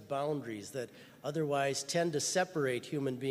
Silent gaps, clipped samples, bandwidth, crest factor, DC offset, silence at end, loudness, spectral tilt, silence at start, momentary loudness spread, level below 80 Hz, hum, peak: none; under 0.1%; 15.5 kHz; 16 dB; under 0.1%; 0 s; -35 LUFS; -4 dB/octave; 0 s; 11 LU; -78 dBFS; none; -18 dBFS